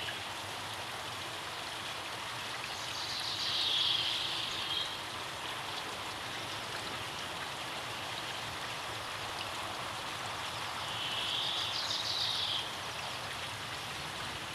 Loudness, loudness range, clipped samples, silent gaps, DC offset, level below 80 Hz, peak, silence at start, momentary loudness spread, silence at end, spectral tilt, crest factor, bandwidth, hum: -35 LUFS; 5 LU; under 0.1%; none; under 0.1%; -64 dBFS; -18 dBFS; 0 s; 8 LU; 0 s; -1.5 dB/octave; 20 dB; 16 kHz; none